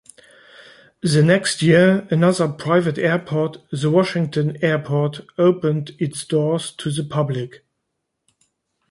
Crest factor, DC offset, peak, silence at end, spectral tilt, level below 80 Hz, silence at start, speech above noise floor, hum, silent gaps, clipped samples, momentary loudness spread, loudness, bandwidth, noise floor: 18 dB; under 0.1%; -2 dBFS; 1.35 s; -6 dB/octave; -60 dBFS; 1.05 s; 58 dB; none; none; under 0.1%; 10 LU; -19 LUFS; 11.5 kHz; -76 dBFS